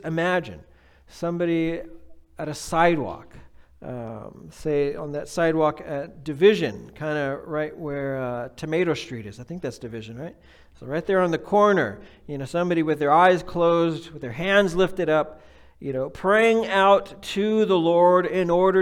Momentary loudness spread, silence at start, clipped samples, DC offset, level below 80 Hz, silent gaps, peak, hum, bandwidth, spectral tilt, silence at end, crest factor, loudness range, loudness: 18 LU; 0.05 s; under 0.1%; under 0.1%; -52 dBFS; none; -4 dBFS; none; 14.5 kHz; -6 dB/octave; 0 s; 18 dB; 7 LU; -22 LUFS